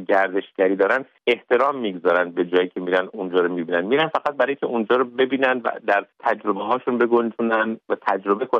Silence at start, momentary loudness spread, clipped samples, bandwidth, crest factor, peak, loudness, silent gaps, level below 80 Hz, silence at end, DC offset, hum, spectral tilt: 0 s; 4 LU; under 0.1%; 6.8 kHz; 16 dB; -4 dBFS; -21 LUFS; none; -72 dBFS; 0 s; under 0.1%; none; -7 dB/octave